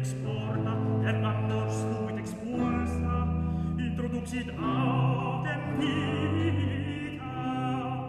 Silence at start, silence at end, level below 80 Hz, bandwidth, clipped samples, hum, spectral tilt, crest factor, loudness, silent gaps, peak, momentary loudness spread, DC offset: 0 s; 0 s; -44 dBFS; 12 kHz; under 0.1%; none; -7 dB/octave; 14 dB; -30 LUFS; none; -16 dBFS; 6 LU; under 0.1%